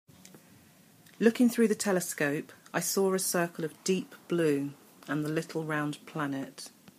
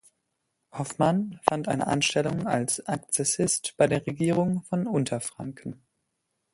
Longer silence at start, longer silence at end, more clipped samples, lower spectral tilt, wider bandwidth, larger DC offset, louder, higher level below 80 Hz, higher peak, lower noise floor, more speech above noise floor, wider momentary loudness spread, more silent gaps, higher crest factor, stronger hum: second, 0.35 s vs 0.75 s; second, 0.1 s vs 0.8 s; neither; about the same, -4.5 dB/octave vs -4.5 dB/octave; first, 15.5 kHz vs 12 kHz; neither; second, -30 LUFS vs -26 LUFS; second, -78 dBFS vs -62 dBFS; second, -10 dBFS vs 0 dBFS; second, -59 dBFS vs -79 dBFS; second, 29 dB vs 52 dB; about the same, 11 LU vs 12 LU; neither; second, 22 dB vs 28 dB; neither